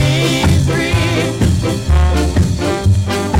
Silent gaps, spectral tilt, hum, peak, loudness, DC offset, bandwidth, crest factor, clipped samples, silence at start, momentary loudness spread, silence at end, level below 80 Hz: none; -5.5 dB/octave; none; 0 dBFS; -14 LUFS; under 0.1%; 16 kHz; 12 dB; under 0.1%; 0 s; 3 LU; 0 s; -22 dBFS